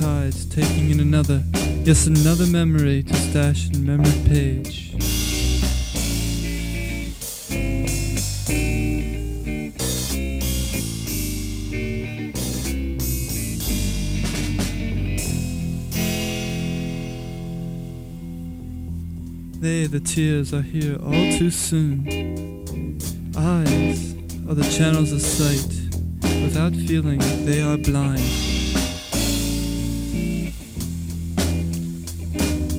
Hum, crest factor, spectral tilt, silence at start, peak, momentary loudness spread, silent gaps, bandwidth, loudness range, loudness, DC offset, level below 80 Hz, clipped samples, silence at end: none; 20 dB; -5 dB/octave; 0 s; -2 dBFS; 12 LU; none; 16.5 kHz; 7 LU; -22 LUFS; under 0.1%; -30 dBFS; under 0.1%; 0 s